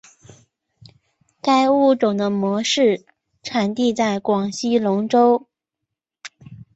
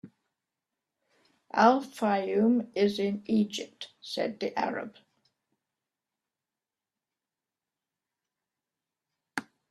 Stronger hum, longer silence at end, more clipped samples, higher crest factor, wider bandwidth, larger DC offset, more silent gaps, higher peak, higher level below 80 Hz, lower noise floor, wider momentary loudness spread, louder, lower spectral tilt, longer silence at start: neither; second, 0.15 s vs 0.3 s; neither; second, 16 dB vs 24 dB; second, 8.2 kHz vs 13 kHz; neither; neither; first, -4 dBFS vs -8 dBFS; first, -64 dBFS vs -76 dBFS; second, -82 dBFS vs under -90 dBFS; about the same, 16 LU vs 16 LU; first, -19 LUFS vs -29 LUFS; about the same, -5 dB/octave vs -5.5 dB/octave; first, 1.45 s vs 0.05 s